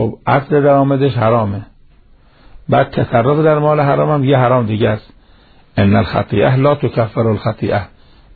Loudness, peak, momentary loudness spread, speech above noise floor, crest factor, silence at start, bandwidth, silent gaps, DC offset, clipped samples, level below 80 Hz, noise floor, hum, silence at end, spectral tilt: -14 LUFS; 0 dBFS; 7 LU; 33 dB; 14 dB; 0 s; 4.7 kHz; none; under 0.1%; under 0.1%; -42 dBFS; -46 dBFS; none; 0.5 s; -11.5 dB/octave